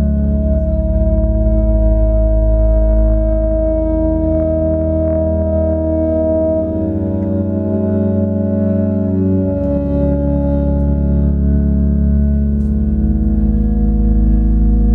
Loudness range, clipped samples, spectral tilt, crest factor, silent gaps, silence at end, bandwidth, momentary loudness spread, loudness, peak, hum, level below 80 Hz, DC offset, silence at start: 1 LU; under 0.1%; -13.5 dB/octave; 10 dB; none; 0 s; 1.9 kHz; 2 LU; -15 LUFS; -2 dBFS; none; -16 dBFS; under 0.1%; 0 s